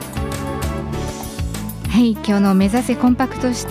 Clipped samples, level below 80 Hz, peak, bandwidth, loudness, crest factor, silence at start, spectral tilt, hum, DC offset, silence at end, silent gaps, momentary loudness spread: under 0.1%; -32 dBFS; -6 dBFS; 15.5 kHz; -19 LUFS; 12 dB; 0 s; -6 dB/octave; none; under 0.1%; 0 s; none; 11 LU